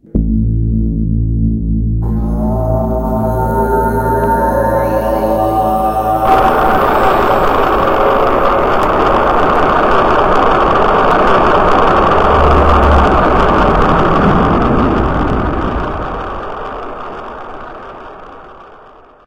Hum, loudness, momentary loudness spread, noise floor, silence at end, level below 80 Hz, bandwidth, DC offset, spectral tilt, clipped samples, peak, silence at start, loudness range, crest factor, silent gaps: none; -12 LUFS; 13 LU; -40 dBFS; 0.5 s; -20 dBFS; 16.5 kHz; under 0.1%; -7.5 dB/octave; under 0.1%; 0 dBFS; 0.15 s; 7 LU; 12 dB; none